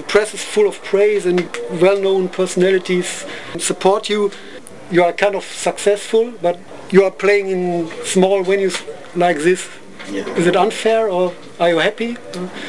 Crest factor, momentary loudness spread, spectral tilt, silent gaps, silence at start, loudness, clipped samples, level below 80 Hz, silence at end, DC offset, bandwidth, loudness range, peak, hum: 16 dB; 11 LU; -4.5 dB/octave; none; 0 s; -17 LUFS; under 0.1%; -60 dBFS; 0 s; 1%; 12 kHz; 2 LU; -2 dBFS; none